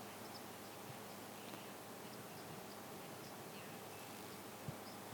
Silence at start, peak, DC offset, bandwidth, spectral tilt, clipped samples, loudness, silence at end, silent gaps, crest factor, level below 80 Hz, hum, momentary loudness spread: 0 s; -34 dBFS; under 0.1%; 19.5 kHz; -3.5 dB/octave; under 0.1%; -51 LUFS; 0 s; none; 18 dB; -84 dBFS; none; 1 LU